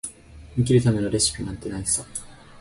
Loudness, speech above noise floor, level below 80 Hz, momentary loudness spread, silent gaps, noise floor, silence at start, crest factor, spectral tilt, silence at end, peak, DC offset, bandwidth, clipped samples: -23 LUFS; 21 dB; -44 dBFS; 16 LU; none; -44 dBFS; 0.05 s; 18 dB; -4.5 dB/octave; 0.25 s; -6 dBFS; under 0.1%; 11.5 kHz; under 0.1%